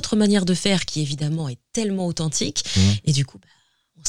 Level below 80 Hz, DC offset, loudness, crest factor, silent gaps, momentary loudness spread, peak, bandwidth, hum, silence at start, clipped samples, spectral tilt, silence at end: -48 dBFS; under 0.1%; -22 LUFS; 18 dB; none; 8 LU; -2 dBFS; 13 kHz; none; 0 s; under 0.1%; -4.5 dB/octave; 0 s